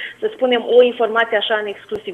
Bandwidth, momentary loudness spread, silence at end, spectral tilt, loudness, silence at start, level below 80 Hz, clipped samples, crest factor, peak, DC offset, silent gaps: 4.1 kHz; 12 LU; 0 s; -4.5 dB/octave; -16 LUFS; 0 s; -62 dBFS; under 0.1%; 16 dB; -2 dBFS; under 0.1%; none